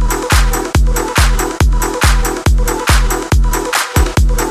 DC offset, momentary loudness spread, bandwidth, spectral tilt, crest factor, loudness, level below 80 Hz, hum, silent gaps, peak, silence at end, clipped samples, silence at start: under 0.1%; 2 LU; 15.5 kHz; -4 dB/octave; 12 dB; -14 LUFS; -14 dBFS; none; none; 0 dBFS; 0 s; under 0.1%; 0 s